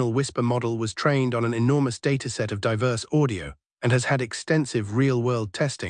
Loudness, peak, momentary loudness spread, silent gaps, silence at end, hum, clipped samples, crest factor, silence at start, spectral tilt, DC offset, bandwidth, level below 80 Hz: -24 LUFS; -8 dBFS; 5 LU; 3.66-3.77 s; 0 s; none; under 0.1%; 16 dB; 0 s; -6 dB/octave; under 0.1%; 10.5 kHz; -56 dBFS